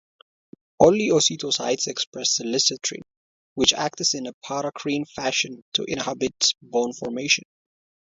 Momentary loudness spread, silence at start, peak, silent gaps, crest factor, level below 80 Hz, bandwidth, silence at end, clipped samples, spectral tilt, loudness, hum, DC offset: 10 LU; 0.8 s; 0 dBFS; 2.07-2.12 s, 3.17-3.56 s, 4.34-4.41 s, 5.62-5.72 s; 24 dB; -60 dBFS; 7.8 kHz; 0.6 s; under 0.1%; -2 dB/octave; -22 LUFS; none; under 0.1%